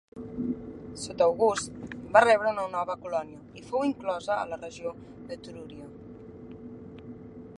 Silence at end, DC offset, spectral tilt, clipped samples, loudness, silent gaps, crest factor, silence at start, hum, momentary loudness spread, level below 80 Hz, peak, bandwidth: 0 s; under 0.1%; -4.5 dB/octave; under 0.1%; -28 LUFS; none; 26 dB; 0.15 s; none; 22 LU; -60 dBFS; -4 dBFS; 11.5 kHz